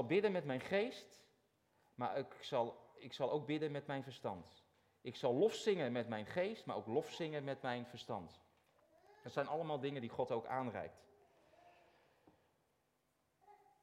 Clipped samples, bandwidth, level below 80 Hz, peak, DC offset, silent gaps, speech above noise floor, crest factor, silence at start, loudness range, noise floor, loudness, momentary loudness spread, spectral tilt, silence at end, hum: under 0.1%; 14.5 kHz; -82 dBFS; -24 dBFS; under 0.1%; none; 41 dB; 20 dB; 0 s; 6 LU; -82 dBFS; -42 LUFS; 13 LU; -6 dB/octave; 0.25 s; none